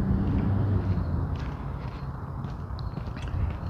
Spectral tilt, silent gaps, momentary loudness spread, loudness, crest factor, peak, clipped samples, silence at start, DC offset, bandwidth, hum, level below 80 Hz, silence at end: -9.5 dB/octave; none; 10 LU; -30 LUFS; 14 dB; -14 dBFS; under 0.1%; 0 s; under 0.1%; 6.4 kHz; none; -36 dBFS; 0 s